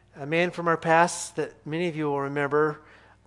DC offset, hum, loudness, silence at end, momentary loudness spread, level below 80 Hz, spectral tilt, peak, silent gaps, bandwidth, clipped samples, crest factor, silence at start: under 0.1%; none; -26 LUFS; 0.45 s; 11 LU; -66 dBFS; -5 dB/octave; -6 dBFS; none; 12 kHz; under 0.1%; 22 dB; 0.15 s